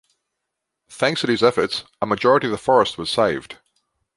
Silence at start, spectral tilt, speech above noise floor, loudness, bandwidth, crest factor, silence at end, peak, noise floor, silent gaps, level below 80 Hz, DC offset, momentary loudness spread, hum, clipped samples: 0.9 s; -4.5 dB/octave; 61 dB; -19 LUFS; 11.5 kHz; 20 dB; 0.65 s; -2 dBFS; -80 dBFS; none; -56 dBFS; under 0.1%; 7 LU; none; under 0.1%